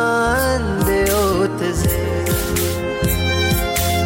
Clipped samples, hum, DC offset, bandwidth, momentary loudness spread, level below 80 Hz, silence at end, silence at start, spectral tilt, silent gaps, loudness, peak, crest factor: under 0.1%; none; under 0.1%; 17 kHz; 3 LU; -28 dBFS; 0 s; 0 s; -4.5 dB/octave; none; -18 LUFS; -6 dBFS; 10 dB